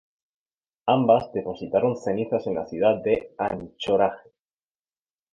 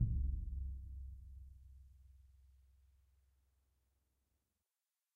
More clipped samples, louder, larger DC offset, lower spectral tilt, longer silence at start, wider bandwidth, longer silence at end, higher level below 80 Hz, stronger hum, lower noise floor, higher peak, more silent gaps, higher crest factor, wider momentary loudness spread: neither; first, -24 LUFS vs -46 LUFS; neither; second, -7 dB/octave vs -10.5 dB/octave; first, 0.85 s vs 0 s; first, 7.4 kHz vs 0.5 kHz; second, 1.15 s vs 2.7 s; second, -58 dBFS vs -48 dBFS; neither; about the same, under -90 dBFS vs under -90 dBFS; first, -6 dBFS vs -24 dBFS; neither; about the same, 20 dB vs 22 dB; second, 10 LU vs 24 LU